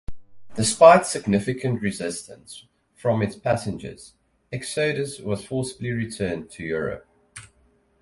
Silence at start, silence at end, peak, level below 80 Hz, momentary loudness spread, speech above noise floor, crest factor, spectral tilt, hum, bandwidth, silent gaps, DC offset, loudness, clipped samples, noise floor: 0.1 s; 0.6 s; 0 dBFS; -52 dBFS; 25 LU; 39 dB; 24 dB; -5 dB/octave; none; 11.5 kHz; none; under 0.1%; -23 LUFS; under 0.1%; -62 dBFS